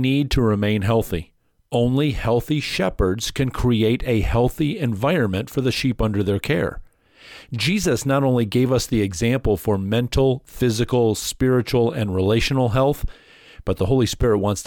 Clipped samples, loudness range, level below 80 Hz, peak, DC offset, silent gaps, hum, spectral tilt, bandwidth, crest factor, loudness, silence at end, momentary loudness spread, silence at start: under 0.1%; 2 LU; -34 dBFS; -8 dBFS; under 0.1%; none; none; -6 dB/octave; 19 kHz; 12 dB; -21 LUFS; 0 s; 4 LU; 0 s